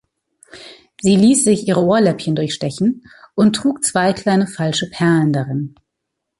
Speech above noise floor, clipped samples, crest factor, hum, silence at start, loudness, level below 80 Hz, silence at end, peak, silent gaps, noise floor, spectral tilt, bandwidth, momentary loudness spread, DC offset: 62 dB; under 0.1%; 14 dB; none; 0.55 s; -16 LUFS; -54 dBFS; 0.7 s; -2 dBFS; none; -77 dBFS; -5 dB/octave; 11.5 kHz; 9 LU; under 0.1%